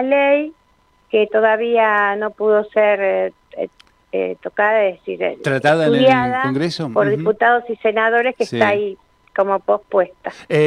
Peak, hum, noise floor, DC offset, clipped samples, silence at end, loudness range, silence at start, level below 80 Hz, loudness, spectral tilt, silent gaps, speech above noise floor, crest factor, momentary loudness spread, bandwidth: -2 dBFS; none; -57 dBFS; under 0.1%; under 0.1%; 0 s; 3 LU; 0 s; -60 dBFS; -17 LUFS; -6 dB/octave; none; 41 dB; 14 dB; 10 LU; 10.5 kHz